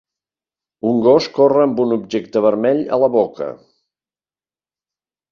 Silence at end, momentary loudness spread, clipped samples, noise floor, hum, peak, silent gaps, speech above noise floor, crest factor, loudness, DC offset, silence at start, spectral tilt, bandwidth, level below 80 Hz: 1.75 s; 9 LU; under 0.1%; under -90 dBFS; none; -2 dBFS; none; over 75 dB; 16 dB; -16 LUFS; under 0.1%; 0.85 s; -7 dB/octave; 7.2 kHz; -62 dBFS